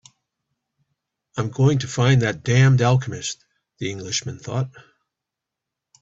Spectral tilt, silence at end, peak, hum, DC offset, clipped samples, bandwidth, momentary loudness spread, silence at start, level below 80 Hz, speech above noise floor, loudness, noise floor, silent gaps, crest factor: -5.5 dB/octave; 1.2 s; -4 dBFS; none; under 0.1%; under 0.1%; 8 kHz; 15 LU; 1.35 s; -54 dBFS; 65 dB; -21 LUFS; -85 dBFS; none; 18 dB